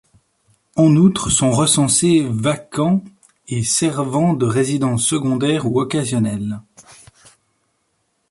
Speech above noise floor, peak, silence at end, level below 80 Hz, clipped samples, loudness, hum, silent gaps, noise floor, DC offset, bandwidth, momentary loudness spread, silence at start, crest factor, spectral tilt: 51 dB; -2 dBFS; 1.5 s; -48 dBFS; under 0.1%; -17 LUFS; none; none; -68 dBFS; under 0.1%; 11.5 kHz; 8 LU; 0.75 s; 16 dB; -5 dB/octave